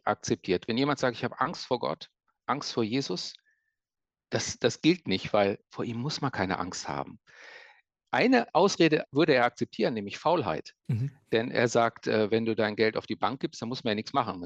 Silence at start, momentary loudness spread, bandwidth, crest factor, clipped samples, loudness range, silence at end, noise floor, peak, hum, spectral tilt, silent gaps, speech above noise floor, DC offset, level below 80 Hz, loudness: 0.05 s; 11 LU; 8.6 kHz; 18 dB; under 0.1%; 6 LU; 0 s; under -90 dBFS; -10 dBFS; none; -5 dB/octave; none; over 62 dB; under 0.1%; -66 dBFS; -28 LUFS